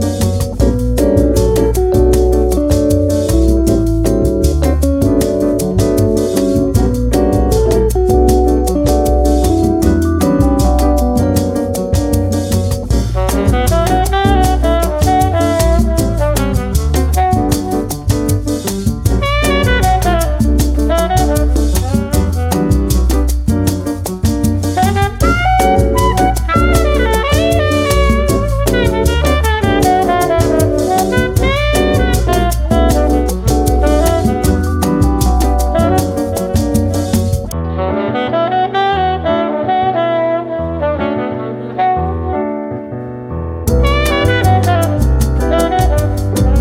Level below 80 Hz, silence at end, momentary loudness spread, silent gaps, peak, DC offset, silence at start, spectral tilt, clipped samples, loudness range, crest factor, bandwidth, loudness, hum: -18 dBFS; 0 s; 5 LU; none; 0 dBFS; under 0.1%; 0 s; -6 dB/octave; under 0.1%; 3 LU; 12 dB; 16.5 kHz; -13 LUFS; none